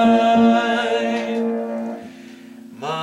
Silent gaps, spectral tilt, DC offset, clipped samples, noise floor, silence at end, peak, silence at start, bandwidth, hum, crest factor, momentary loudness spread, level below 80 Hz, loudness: none; -5.5 dB/octave; under 0.1%; under 0.1%; -39 dBFS; 0 s; -4 dBFS; 0 s; 10.5 kHz; none; 14 dB; 25 LU; -64 dBFS; -19 LUFS